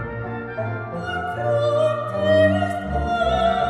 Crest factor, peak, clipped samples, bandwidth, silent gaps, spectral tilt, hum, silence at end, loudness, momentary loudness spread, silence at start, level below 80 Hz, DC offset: 16 dB; -6 dBFS; under 0.1%; 11 kHz; none; -7 dB/octave; none; 0 s; -22 LUFS; 11 LU; 0 s; -38 dBFS; under 0.1%